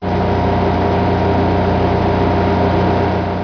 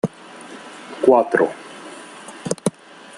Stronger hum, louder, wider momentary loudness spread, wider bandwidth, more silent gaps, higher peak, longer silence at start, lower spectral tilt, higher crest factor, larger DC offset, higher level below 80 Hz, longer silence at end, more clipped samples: first, 60 Hz at -30 dBFS vs none; first, -15 LUFS vs -19 LUFS; second, 1 LU vs 22 LU; second, 5.4 kHz vs 12 kHz; neither; about the same, -4 dBFS vs -2 dBFS; about the same, 0 s vs 0.05 s; first, -8.5 dB/octave vs -5 dB/octave; second, 10 dB vs 20 dB; neither; first, -30 dBFS vs -64 dBFS; second, 0 s vs 0.5 s; neither